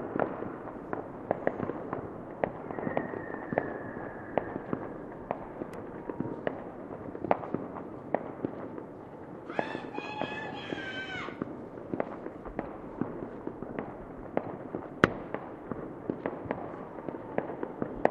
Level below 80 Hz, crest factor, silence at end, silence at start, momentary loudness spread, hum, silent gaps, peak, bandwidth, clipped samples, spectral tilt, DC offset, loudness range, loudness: -60 dBFS; 36 dB; 0 s; 0 s; 9 LU; none; none; -2 dBFS; 12 kHz; under 0.1%; -7 dB/octave; under 0.1%; 3 LU; -37 LUFS